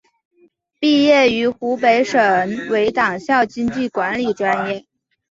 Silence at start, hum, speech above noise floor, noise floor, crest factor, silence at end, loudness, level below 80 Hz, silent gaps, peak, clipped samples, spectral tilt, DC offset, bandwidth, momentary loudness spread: 0.8 s; none; 41 dB; -57 dBFS; 16 dB; 0.55 s; -17 LUFS; -56 dBFS; none; -2 dBFS; under 0.1%; -4.5 dB/octave; under 0.1%; 7.8 kHz; 8 LU